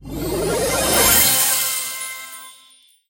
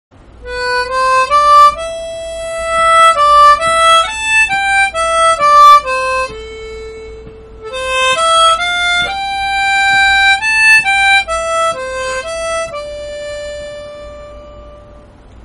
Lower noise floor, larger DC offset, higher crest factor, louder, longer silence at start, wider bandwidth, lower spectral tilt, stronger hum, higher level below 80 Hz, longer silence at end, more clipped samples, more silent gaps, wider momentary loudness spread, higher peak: first, -52 dBFS vs -38 dBFS; neither; first, 18 dB vs 12 dB; second, -16 LUFS vs -9 LUFS; second, 0 s vs 0.4 s; first, 17 kHz vs 14.5 kHz; about the same, -1.5 dB/octave vs -0.5 dB/octave; neither; about the same, -38 dBFS vs -38 dBFS; about the same, 0.6 s vs 0.5 s; second, under 0.1% vs 0.6%; neither; about the same, 19 LU vs 19 LU; about the same, -2 dBFS vs 0 dBFS